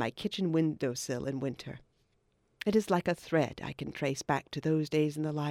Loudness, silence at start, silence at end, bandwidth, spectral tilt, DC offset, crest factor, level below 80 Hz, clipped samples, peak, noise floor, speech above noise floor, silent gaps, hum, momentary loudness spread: -32 LUFS; 0 s; 0 s; 15.5 kHz; -6 dB/octave; under 0.1%; 18 dB; -64 dBFS; under 0.1%; -14 dBFS; -73 dBFS; 41 dB; none; none; 9 LU